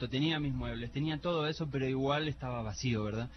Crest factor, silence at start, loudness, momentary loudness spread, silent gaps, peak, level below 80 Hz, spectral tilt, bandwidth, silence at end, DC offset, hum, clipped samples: 14 dB; 0 s; -35 LUFS; 6 LU; none; -20 dBFS; -50 dBFS; -6 dB/octave; 6.4 kHz; 0 s; under 0.1%; none; under 0.1%